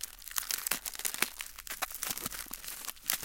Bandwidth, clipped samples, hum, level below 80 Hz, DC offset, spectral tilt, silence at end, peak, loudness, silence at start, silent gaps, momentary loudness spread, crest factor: 17 kHz; under 0.1%; none; -60 dBFS; under 0.1%; 0.5 dB/octave; 0 s; -4 dBFS; -35 LUFS; 0 s; none; 8 LU; 34 dB